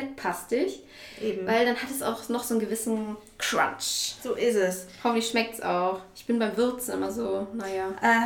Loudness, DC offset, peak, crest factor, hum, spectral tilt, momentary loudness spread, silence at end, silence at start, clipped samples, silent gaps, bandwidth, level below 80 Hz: -28 LUFS; under 0.1%; -10 dBFS; 18 dB; none; -3 dB/octave; 7 LU; 0 s; 0 s; under 0.1%; none; 18 kHz; -62 dBFS